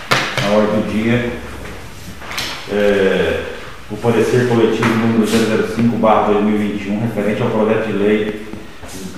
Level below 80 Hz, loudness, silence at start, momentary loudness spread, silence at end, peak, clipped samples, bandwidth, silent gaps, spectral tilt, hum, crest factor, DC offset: -40 dBFS; -16 LUFS; 0 s; 17 LU; 0 s; 0 dBFS; under 0.1%; 15 kHz; none; -5.5 dB/octave; none; 16 dB; 2%